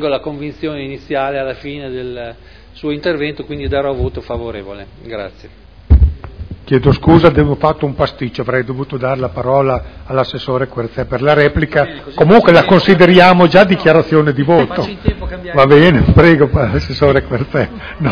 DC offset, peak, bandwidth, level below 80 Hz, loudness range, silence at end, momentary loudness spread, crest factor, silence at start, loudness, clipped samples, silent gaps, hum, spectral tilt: under 0.1%; 0 dBFS; 5.4 kHz; -24 dBFS; 12 LU; 0 s; 18 LU; 12 dB; 0 s; -12 LUFS; 0.9%; none; none; -8.5 dB/octave